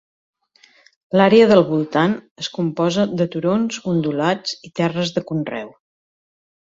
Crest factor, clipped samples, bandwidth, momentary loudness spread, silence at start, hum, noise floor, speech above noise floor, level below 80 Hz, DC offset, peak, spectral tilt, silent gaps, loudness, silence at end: 18 dB; under 0.1%; 7.8 kHz; 14 LU; 1.15 s; none; -54 dBFS; 37 dB; -60 dBFS; under 0.1%; -2 dBFS; -6 dB/octave; 2.31-2.36 s; -18 LUFS; 1.05 s